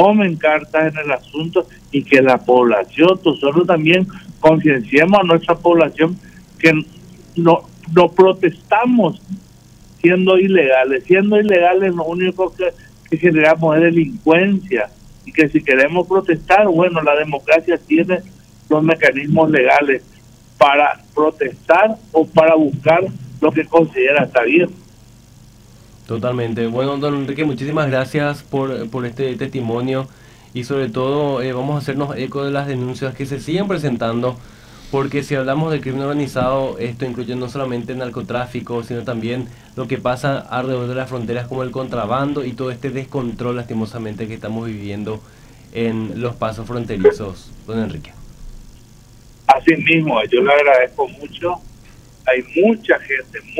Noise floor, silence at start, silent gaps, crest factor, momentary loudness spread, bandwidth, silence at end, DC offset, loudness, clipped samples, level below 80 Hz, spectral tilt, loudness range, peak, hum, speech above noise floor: -44 dBFS; 0 s; none; 16 dB; 12 LU; 14 kHz; 0 s; under 0.1%; -16 LUFS; under 0.1%; -46 dBFS; -7 dB/octave; 9 LU; 0 dBFS; none; 28 dB